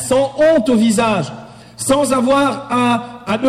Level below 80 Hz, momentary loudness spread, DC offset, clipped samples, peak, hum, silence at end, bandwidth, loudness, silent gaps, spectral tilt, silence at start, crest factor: -48 dBFS; 9 LU; under 0.1%; under 0.1%; -6 dBFS; none; 0 s; 14.5 kHz; -15 LUFS; none; -4.5 dB/octave; 0 s; 10 dB